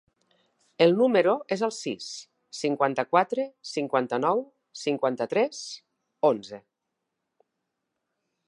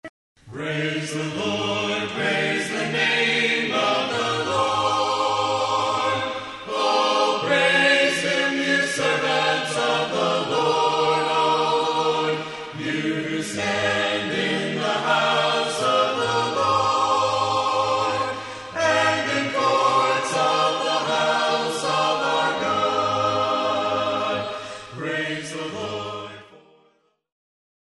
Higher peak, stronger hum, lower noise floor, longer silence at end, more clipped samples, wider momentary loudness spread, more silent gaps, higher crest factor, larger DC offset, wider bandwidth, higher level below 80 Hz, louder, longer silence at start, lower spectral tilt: about the same, -6 dBFS vs -6 dBFS; neither; first, -83 dBFS vs -63 dBFS; first, 1.9 s vs 1.25 s; neither; first, 18 LU vs 9 LU; second, none vs 0.09-0.35 s; first, 22 dB vs 16 dB; neither; about the same, 11 kHz vs 11.5 kHz; second, -82 dBFS vs -62 dBFS; second, -26 LUFS vs -21 LUFS; first, 0.8 s vs 0.05 s; first, -5 dB/octave vs -3.5 dB/octave